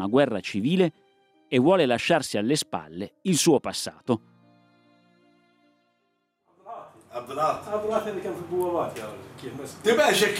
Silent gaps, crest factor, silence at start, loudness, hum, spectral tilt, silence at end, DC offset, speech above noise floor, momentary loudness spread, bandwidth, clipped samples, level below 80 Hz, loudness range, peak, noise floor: none; 18 dB; 0 s; -25 LUFS; none; -4.5 dB/octave; 0 s; under 0.1%; 49 dB; 19 LU; 16 kHz; under 0.1%; -70 dBFS; 12 LU; -8 dBFS; -73 dBFS